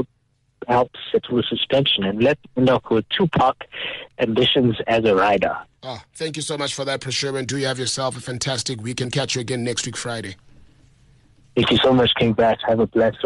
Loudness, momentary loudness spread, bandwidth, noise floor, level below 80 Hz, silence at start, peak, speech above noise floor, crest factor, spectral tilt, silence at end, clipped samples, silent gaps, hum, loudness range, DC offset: -20 LUFS; 12 LU; 12 kHz; -65 dBFS; -50 dBFS; 0 s; -8 dBFS; 44 dB; 12 dB; -4.5 dB/octave; 0 s; under 0.1%; none; none; 6 LU; under 0.1%